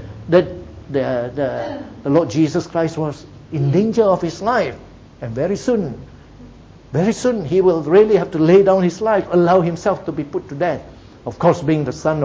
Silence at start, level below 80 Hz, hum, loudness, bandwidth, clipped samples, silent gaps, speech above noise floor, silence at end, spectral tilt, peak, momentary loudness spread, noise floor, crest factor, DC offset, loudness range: 0 s; -46 dBFS; none; -17 LUFS; 8 kHz; under 0.1%; none; 24 dB; 0 s; -7 dB/octave; 0 dBFS; 15 LU; -41 dBFS; 16 dB; under 0.1%; 6 LU